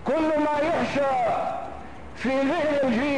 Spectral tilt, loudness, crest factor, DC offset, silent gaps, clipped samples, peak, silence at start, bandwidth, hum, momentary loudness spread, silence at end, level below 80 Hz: -6 dB/octave; -24 LUFS; 10 dB; 0.8%; none; under 0.1%; -14 dBFS; 0 s; 10.5 kHz; none; 12 LU; 0 s; -50 dBFS